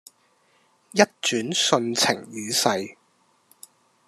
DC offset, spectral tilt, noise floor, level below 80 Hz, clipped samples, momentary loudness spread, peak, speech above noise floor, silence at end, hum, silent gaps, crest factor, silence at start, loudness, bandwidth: under 0.1%; -2.5 dB/octave; -64 dBFS; -74 dBFS; under 0.1%; 8 LU; -2 dBFS; 41 dB; 1.15 s; none; none; 24 dB; 0.95 s; -22 LUFS; 14 kHz